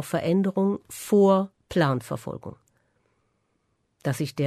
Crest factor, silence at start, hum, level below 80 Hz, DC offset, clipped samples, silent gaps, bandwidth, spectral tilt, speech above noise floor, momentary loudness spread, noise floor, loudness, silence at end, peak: 16 dB; 0 s; none; -60 dBFS; under 0.1%; under 0.1%; none; 13.5 kHz; -6.5 dB/octave; 49 dB; 15 LU; -72 dBFS; -24 LUFS; 0 s; -10 dBFS